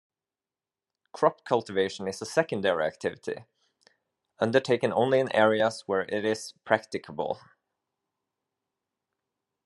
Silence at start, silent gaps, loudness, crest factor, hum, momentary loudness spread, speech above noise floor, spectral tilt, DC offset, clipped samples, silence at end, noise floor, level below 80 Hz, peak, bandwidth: 1.15 s; none; -27 LUFS; 24 dB; none; 11 LU; over 63 dB; -5 dB/octave; under 0.1%; under 0.1%; 2.25 s; under -90 dBFS; -76 dBFS; -6 dBFS; 12 kHz